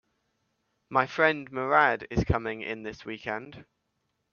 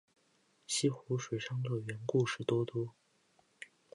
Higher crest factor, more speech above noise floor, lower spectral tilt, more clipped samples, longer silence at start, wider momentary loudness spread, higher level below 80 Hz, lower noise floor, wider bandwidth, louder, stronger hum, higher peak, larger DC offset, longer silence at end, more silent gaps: about the same, 24 dB vs 20 dB; first, 50 dB vs 38 dB; first, -6.5 dB/octave vs -5 dB/octave; neither; first, 0.9 s vs 0.7 s; about the same, 14 LU vs 14 LU; first, -48 dBFS vs -76 dBFS; first, -78 dBFS vs -73 dBFS; second, 7 kHz vs 11 kHz; first, -27 LUFS vs -36 LUFS; neither; first, -6 dBFS vs -18 dBFS; neither; first, 0.7 s vs 0.3 s; neither